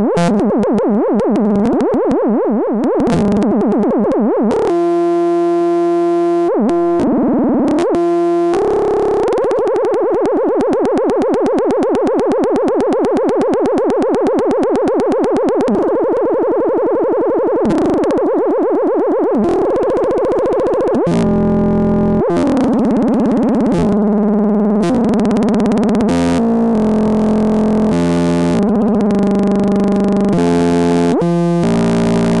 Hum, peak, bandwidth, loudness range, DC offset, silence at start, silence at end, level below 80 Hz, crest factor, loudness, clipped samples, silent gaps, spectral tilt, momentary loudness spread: none; -4 dBFS; 11.5 kHz; 1 LU; 0.9%; 0 s; 0 s; -40 dBFS; 8 dB; -14 LUFS; under 0.1%; none; -8 dB/octave; 1 LU